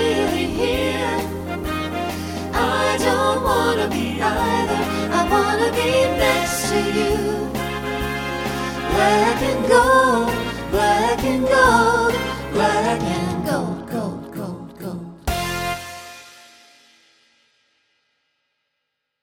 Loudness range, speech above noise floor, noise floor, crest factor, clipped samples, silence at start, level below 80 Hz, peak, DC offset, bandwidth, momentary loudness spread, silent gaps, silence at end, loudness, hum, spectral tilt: 12 LU; 61 dB; -77 dBFS; 18 dB; under 0.1%; 0 s; -38 dBFS; -2 dBFS; under 0.1%; 17 kHz; 12 LU; none; 2.9 s; -19 LUFS; none; -4.5 dB/octave